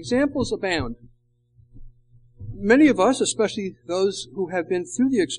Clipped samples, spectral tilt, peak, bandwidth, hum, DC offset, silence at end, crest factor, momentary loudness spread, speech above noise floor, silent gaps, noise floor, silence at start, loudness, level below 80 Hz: under 0.1%; -4.5 dB/octave; -4 dBFS; 10.5 kHz; 60 Hz at -50 dBFS; under 0.1%; 0 s; 18 dB; 15 LU; 39 dB; none; -60 dBFS; 0 s; -22 LUFS; -46 dBFS